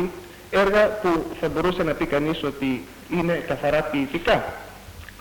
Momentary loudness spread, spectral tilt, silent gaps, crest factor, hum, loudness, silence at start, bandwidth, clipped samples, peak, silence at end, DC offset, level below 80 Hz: 15 LU; -6 dB/octave; none; 18 dB; none; -23 LUFS; 0 s; 19 kHz; under 0.1%; -6 dBFS; 0 s; under 0.1%; -44 dBFS